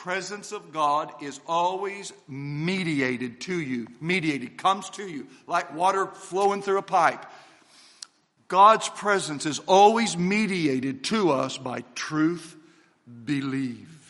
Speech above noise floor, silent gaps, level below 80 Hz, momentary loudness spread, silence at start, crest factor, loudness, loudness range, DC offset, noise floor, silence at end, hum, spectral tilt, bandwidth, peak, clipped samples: 31 dB; none; -72 dBFS; 18 LU; 0 s; 22 dB; -25 LUFS; 6 LU; under 0.1%; -56 dBFS; 0.15 s; none; -4.5 dB/octave; 11.5 kHz; -4 dBFS; under 0.1%